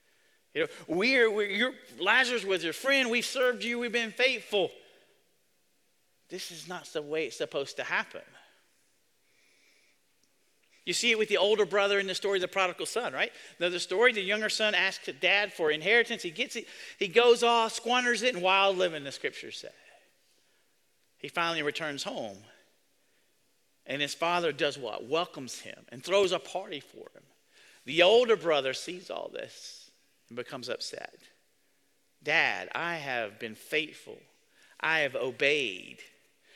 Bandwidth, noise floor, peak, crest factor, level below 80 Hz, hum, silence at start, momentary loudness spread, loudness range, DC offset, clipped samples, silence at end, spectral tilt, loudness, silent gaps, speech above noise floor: 15.5 kHz; -73 dBFS; -8 dBFS; 24 dB; -78 dBFS; none; 0.55 s; 17 LU; 10 LU; under 0.1%; under 0.1%; 0.5 s; -2.5 dB/octave; -28 LUFS; none; 43 dB